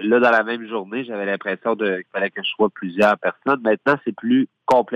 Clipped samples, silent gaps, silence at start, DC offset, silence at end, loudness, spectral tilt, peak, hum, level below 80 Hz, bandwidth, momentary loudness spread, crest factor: under 0.1%; none; 0 s; under 0.1%; 0 s; -20 LUFS; -6 dB/octave; -4 dBFS; none; -66 dBFS; 11 kHz; 8 LU; 16 dB